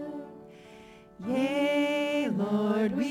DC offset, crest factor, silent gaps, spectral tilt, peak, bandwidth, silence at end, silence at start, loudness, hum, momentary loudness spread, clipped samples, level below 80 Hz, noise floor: under 0.1%; 12 dB; none; -6 dB/octave; -16 dBFS; 16.5 kHz; 0 s; 0 s; -28 LUFS; none; 16 LU; under 0.1%; -68 dBFS; -51 dBFS